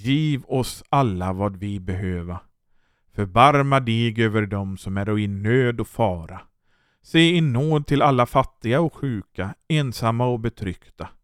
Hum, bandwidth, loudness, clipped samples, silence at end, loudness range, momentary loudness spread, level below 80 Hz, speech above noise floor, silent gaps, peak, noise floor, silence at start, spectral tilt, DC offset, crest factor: none; 15.5 kHz; -21 LUFS; under 0.1%; 0.15 s; 3 LU; 15 LU; -46 dBFS; 43 dB; none; -2 dBFS; -65 dBFS; 0 s; -6.5 dB/octave; under 0.1%; 20 dB